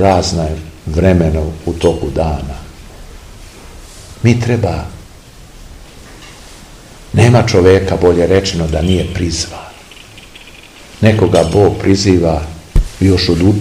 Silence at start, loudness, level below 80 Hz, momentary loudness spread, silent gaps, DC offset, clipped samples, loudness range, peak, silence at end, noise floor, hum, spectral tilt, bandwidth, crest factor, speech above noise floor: 0 s; -13 LUFS; -26 dBFS; 25 LU; none; 0.1%; 0.5%; 7 LU; 0 dBFS; 0 s; -36 dBFS; none; -6 dB/octave; 15 kHz; 14 dB; 25 dB